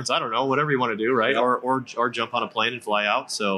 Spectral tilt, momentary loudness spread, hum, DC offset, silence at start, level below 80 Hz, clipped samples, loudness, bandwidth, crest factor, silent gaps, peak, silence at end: -4 dB/octave; 5 LU; none; under 0.1%; 0 s; -78 dBFS; under 0.1%; -23 LUFS; 12.5 kHz; 16 dB; none; -8 dBFS; 0 s